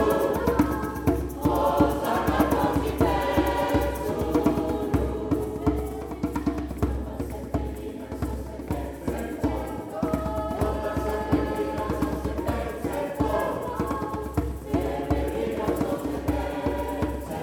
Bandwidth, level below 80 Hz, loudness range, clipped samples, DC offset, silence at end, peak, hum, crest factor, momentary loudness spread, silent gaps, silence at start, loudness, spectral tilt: 19 kHz; -36 dBFS; 7 LU; under 0.1%; under 0.1%; 0 s; -6 dBFS; none; 20 dB; 8 LU; none; 0 s; -27 LUFS; -7 dB/octave